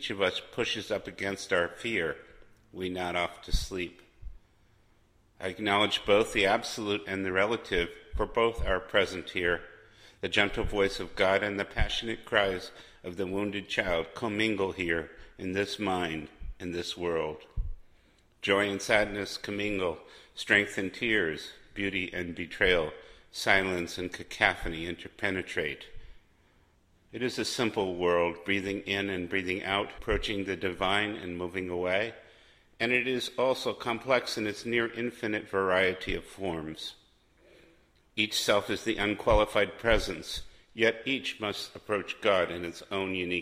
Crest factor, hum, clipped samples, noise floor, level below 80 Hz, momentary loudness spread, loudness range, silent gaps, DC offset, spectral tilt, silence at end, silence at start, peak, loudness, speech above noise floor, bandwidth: 26 dB; none; under 0.1%; -65 dBFS; -46 dBFS; 12 LU; 5 LU; none; under 0.1%; -4 dB/octave; 0 s; 0 s; -6 dBFS; -30 LUFS; 34 dB; 15.5 kHz